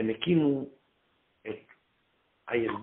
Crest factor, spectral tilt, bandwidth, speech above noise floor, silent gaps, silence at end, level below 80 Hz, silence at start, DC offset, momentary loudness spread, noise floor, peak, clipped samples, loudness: 18 dB; -5.5 dB/octave; 4 kHz; 44 dB; none; 0 s; -68 dBFS; 0 s; under 0.1%; 19 LU; -72 dBFS; -14 dBFS; under 0.1%; -28 LUFS